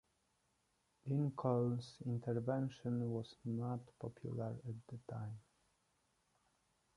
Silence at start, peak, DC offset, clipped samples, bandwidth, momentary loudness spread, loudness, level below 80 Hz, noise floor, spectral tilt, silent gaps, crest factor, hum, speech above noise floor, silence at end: 1.05 s; -22 dBFS; under 0.1%; under 0.1%; 11 kHz; 13 LU; -43 LUFS; -76 dBFS; -81 dBFS; -9 dB/octave; none; 20 dB; none; 40 dB; 1.55 s